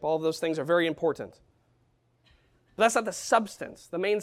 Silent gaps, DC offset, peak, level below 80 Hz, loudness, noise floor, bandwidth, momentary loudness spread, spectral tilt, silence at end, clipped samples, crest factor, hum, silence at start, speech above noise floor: none; under 0.1%; -10 dBFS; -68 dBFS; -27 LUFS; -68 dBFS; 15.5 kHz; 14 LU; -4 dB/octave; 0 s; under 0.1%; 20 dB; none; 0 s; 41 dB